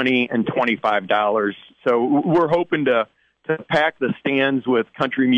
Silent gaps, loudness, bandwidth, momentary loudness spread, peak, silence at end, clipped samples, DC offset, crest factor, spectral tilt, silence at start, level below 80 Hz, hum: none; -20 LUFS; 8.2 kHz; 8 LU; -6 dBFS; 0 s; under 0.1%; under 0.1%; 14 dB; -7 dB/octave; 0 s; -62 dBFS; none